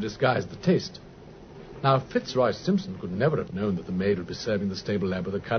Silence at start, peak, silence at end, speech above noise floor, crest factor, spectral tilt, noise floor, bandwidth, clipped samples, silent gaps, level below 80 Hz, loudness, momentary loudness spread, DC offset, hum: 0 s; -10 dBFS; 0 s; 20 dB; 18 dB; -6.5 dB/octave; -46 dBFS; 6.6 kHz; under 0.1%; none; -54 dBFS; -27 LUFS; 20 LU; under 0.1%; none